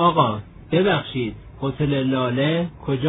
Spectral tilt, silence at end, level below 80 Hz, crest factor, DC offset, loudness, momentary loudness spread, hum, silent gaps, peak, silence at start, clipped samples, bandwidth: -10 dB/octave; 0 s; -46 dBFS; 18 dB; under 0.1%; -22 LUFS; 10 LU; none; none; -2 dBFS; 0 s; under 0.1%; 4 kHz